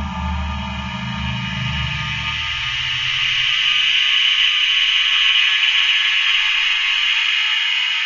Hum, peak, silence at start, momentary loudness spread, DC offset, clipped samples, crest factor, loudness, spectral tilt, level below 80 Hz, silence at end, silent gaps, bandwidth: none; -4 dBFS; 0 s; 11 LU; under 0.1%; under 0.1%; 14 dB; -15 LUFS; -2 dB/octave; -34 dBFS; 0 s; none; 7.6 kHz